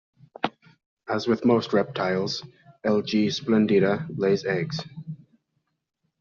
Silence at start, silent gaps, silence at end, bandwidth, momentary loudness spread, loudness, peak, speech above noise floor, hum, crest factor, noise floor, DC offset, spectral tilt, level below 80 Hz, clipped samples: 0.45 s; 0.86-0.97 s; 1.05 s; 7.2 kHz; 14 LU; -25 LUFS; -8 dBFS; 53 dB; none; 18 dB; -76 dBFS; under 0.1%; -5 dB/octave; -64 dBFS; under 0.1%